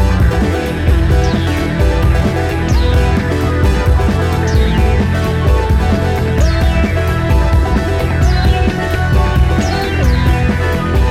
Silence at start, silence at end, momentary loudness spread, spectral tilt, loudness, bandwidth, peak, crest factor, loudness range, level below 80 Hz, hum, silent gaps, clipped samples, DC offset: 0 s; 0 s; 3 LU; -6.5 dB/octave; -13 LUFS; 14.5 kHz; 0 dBFS; 12 dB; 0 LU; -14 dBFS; none; none; under 0.1%; under 0.1%